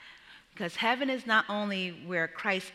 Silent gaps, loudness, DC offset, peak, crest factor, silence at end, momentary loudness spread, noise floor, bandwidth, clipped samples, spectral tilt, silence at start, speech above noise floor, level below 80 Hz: none; -30 LUFS; under 0.1%; -12 dBFS; 20 dB; 0 s; 10 LU; -54 dBFS; 14.5 kHz; under 0.1%; -4.5 dB/octave; 0 s; 23 dB; -76 dBFS